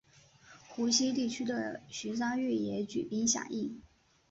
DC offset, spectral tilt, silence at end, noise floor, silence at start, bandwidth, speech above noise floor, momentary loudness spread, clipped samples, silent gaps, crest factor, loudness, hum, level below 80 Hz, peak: under 0.1%; -3 dB/octave; 0.5 s; -61 dBFS; 0.45 s; 8.2 kHz; 27 dB; 12 LU; under 0.1%; none; 18 dB; -33 LUFS; none; -70 dBFS; -16 dBFS